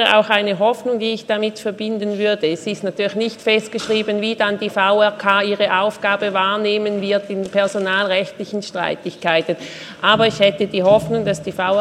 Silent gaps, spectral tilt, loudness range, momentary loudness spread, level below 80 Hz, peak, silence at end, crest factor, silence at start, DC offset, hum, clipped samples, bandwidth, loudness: none; -4.5 dB/octave; 3 LU; 8 LU; -58 dBFS; 0 dBFS; 0 s; 18 dB; 0 s; under 0.1%; none; under 0.1%; 13 kHz; -18 LUFS